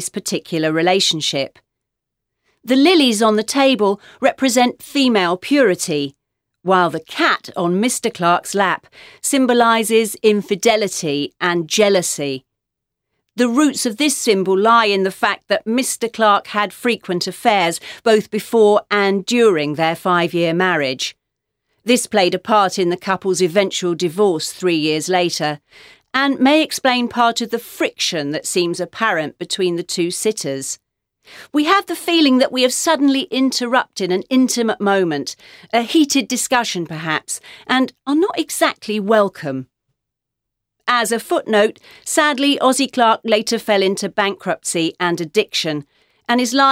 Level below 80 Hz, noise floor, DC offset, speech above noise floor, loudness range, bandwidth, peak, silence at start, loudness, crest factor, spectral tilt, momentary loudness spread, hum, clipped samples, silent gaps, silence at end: -66 dBFS; -81 dBFS; under 0.1%; 64 dB; 3 LU; 16.5 kHz; 0 dBFS; 0 s; -17 LUFS; 16 dB; -3.5 dB/octave; 8 LU; none; under 0.1%; none; 0 s